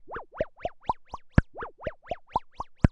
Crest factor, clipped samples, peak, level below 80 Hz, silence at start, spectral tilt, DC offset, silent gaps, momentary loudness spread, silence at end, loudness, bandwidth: 26 dB; under 0.1%; -4 dBFS; -38 dBFS; 0.05 s; -9 dB/octave; under 0.1%; none; 13 LU; 0 s; -32 LUFS; 8.6 kHz